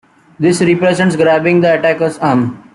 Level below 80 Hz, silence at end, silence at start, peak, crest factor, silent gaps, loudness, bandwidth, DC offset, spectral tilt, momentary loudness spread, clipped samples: -52 dBFS; 0.15 s; 0.4 s; 0 dBFS; 12 dB; none; -12 LUFS; 12 kHz; under 0.1%; -6 dB/octave; 4 LU; under 0.1%